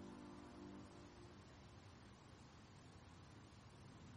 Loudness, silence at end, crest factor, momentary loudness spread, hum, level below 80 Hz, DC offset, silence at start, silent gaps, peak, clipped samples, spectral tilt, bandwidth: -61 LUFS; 0 s; 14 dB; 5 LU; none; -72 dBFS; under 0.1%; 0 s; none; -46 dBFS; under 0.1%; -5.5 dB/octave; 11 kHz